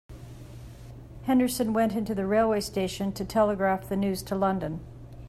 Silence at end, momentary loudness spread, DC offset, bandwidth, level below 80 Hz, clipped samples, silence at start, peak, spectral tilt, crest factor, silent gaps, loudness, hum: 0 s; 21 LU; under 0.1%; 15 kHz; -50 dBFS; under 0.1%; 0.1 s; -12 dBFS; -5.5 dB/octave; 16 dB; none; -27 LUFS; none